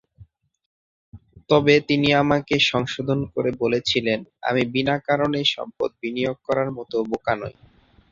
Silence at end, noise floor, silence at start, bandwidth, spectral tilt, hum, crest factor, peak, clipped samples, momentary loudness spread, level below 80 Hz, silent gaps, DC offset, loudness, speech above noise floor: 0.6 s; -51 dBFS; 0.2 s; 7.6 kHz; -5.5 dB/octave; none; 20 dB; -2 dBFS; under 0.1%; 9 LU; -54 dBFS; 0.66-1.12 s; under 0.1%; -22 LUFS; 30 dB